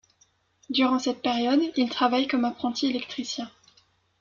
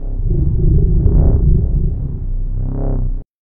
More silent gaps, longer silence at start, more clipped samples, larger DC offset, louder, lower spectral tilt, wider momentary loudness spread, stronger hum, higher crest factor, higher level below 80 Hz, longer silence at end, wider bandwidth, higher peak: second, none vs 3.29-3.34 s; first, 0.7 s vs 0 s; neither; neither; second, -26 LUFS vs -17 LUFS; second, -3 dB/octave vs -15.5 dB/octave; about the same, 9 LU vs 10 LU; neither; about the same, 18 dB vs 14 dB; second, -68 dBFS vs -14 dBFS; first, 0.7 s vs 0 s; first, 7.4 kHz vs 1.5 kHz; second, -10 dBFS vs 0 dBFS